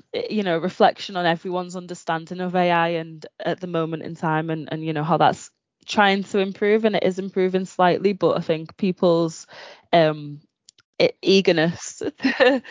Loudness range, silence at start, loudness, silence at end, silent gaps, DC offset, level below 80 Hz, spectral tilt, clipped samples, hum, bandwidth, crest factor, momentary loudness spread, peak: 4 LU; 0.15 s; -21 LUFS; 0 s; 10.85-10.93 s; under 0.1%; -68 dBFS; -5.5 dB/octave; under 0.1%; none; 7.6 kHz; 18 dB; 11 LU; -2 dBFS